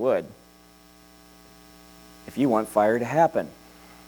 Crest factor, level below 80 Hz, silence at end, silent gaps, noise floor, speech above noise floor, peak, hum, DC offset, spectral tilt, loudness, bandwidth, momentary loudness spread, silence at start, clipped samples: 20 dB; -60 dBFS; 0.55 s; none; -53 dBFS; 30 dB; -8 dBFS; none; under 0.1%; -6.5 dB/octave; -23 LUFS; over 20 kHz; 19 LU; 0 s; under 0.1%